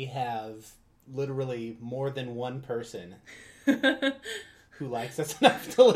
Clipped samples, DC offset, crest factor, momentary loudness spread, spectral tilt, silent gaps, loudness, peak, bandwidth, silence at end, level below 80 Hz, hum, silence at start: under 0.1%; under 0.1%; 24 dB; 20 LU; -5 dB/octave; none; -29 LUFS; -4 dBFS; 15 kHz; 0 s; -68 dBFS; none; 0 s